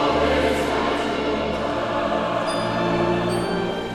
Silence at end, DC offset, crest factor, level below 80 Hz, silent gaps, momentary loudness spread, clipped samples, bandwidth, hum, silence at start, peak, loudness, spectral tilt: 0 s; under 0.1%; 14 dB; -40 dBFS; none; 4 LU; under 0.1%; 16 kHz; none; 0 s; -8 dBFS; -22 LUFS; -5.5 dB/octave